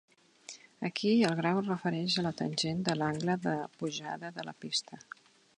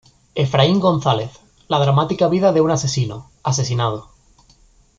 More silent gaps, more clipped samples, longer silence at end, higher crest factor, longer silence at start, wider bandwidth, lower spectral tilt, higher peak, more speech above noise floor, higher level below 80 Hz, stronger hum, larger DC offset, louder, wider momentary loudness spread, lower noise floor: neither; neither; second, 0.6 s vs 0.95 s; about the same, 20 dB vs 16 dB; first, 0.5 s vs 0.35 s; first, 11 kHz vs 7.8 kHz; about the same, -5 dB/octave vs -5.5 dB/octave; second, -14 dBFS vs -2 dBFS; second, 21 dB vs 36 dB; second, -70 dBFS vs -50 dBFS; neither; neither; second, -32 LUFS vs -18 LUFS; first, 21 LU vs 11 LU; about the same, -53 dBFS vs -53 dBFS